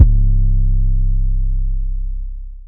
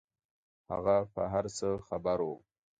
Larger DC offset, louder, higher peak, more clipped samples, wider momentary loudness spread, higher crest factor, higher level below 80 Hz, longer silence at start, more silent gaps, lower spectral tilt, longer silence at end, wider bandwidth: neither; first, -20 LUFS vs -33 LUFS; first, 0 dBFS vs -16 dBFS; first, 0.5% vs under 0.1%; about the same, 11 LU vs 9 LU; about the same, 14 dB vs 18 dB; first, -14 dBFS vs -60 dBFS; second, 0 s vs 0.7 s; neither; first, -13 dB/octave vs -6 dB/octave; second, 0 s vs 0.4 s; second, 0.6 kHz vs 9.4 kHz